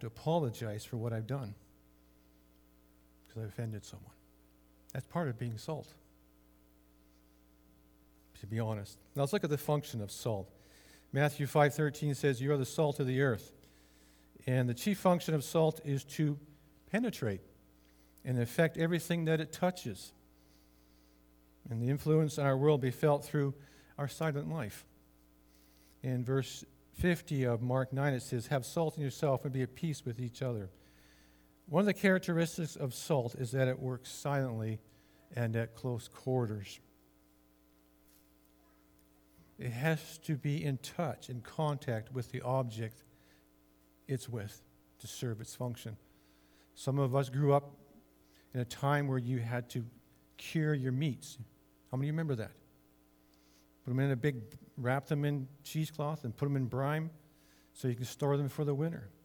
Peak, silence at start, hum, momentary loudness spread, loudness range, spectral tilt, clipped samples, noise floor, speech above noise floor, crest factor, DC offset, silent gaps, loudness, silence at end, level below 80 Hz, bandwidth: -14 dBFS; 0 s; none; 14 LU; 10 LU; -6.5 dB/octave; under 0.1%; -67 dBFS; 33 dB; 22 dB; under 0.1%; none; -35 LUFS; 0.15 s; -66 dBFS; over 20 kHz